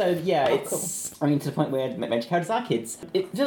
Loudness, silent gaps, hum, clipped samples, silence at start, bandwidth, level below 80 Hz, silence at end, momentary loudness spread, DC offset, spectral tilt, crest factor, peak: -26 LUFS; none; none; under 0.1%; 0 s; 19 kHz; -66 dBFS; 0 s; 6 LU; under 0.1%; -5 dB/octave; 18 dB; -8 dBFS